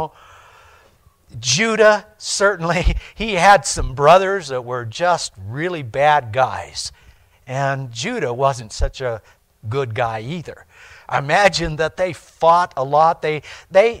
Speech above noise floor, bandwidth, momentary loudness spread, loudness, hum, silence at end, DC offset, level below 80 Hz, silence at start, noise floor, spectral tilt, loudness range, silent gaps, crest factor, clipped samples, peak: 35 dB; 15.5 kHz; 14 LU; -18 LUFS; none; 0 s; under 0.1%; -32 dBFS; 0 s; -53 dBFS; -3.5 dB/octave; 8 LU; none; 18 dB; under 0.1%; -2 dBFS